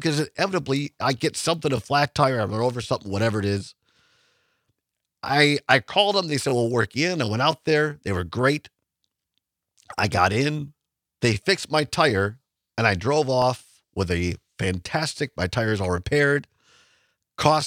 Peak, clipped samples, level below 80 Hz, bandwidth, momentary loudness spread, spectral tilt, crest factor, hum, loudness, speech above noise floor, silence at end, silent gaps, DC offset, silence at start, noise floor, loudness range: 0 dBFS; under 0.1%; -54 dBFS; 16 kHz; 9 LU; -5 dB/octave; 24 dB; none; -23 LUFS; 60 dB; 0 s; none; under 0.1%; 0 s; -82 dBFS; 4 LU